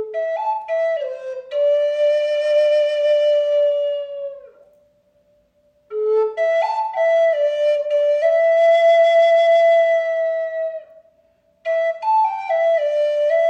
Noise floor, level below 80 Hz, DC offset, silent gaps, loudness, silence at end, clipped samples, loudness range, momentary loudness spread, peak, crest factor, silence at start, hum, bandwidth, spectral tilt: -60 dBFS; -76 dBFS; under 0.1%; none; -17 LUFS; 0 s; under 0.1%; 7 LU; 12 LU; -8 dBFS; 10 dB; 0 s; none; 7.8 kHz; -0.5 dB/octave